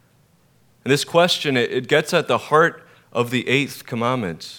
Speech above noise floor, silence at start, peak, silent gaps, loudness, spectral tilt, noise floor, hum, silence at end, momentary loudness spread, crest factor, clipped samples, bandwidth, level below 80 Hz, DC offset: 38 dB; 0.85 s; -2 dBFS; none; -19 LUFS; -4.5 dB/octave; -58 dBFS; none; 0 s; 9 LU; 20 dB; under 0.1%; 19 kHz; -66 dBFS; under 0.1%